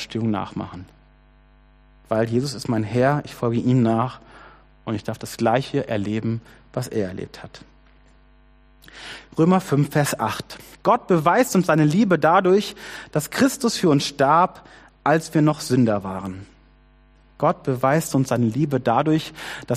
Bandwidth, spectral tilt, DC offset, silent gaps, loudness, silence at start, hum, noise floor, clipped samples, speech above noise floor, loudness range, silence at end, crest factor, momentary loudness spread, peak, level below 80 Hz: 15 kHz; -6 dB/octave; under 0.1%; none; -21 LUFS; 0 s; none; -53 dBFS; under 0.1%; 32 dB; 7 LU; 0 s; 18 dB; 15 LU; -4 dBFS; -54 dBFS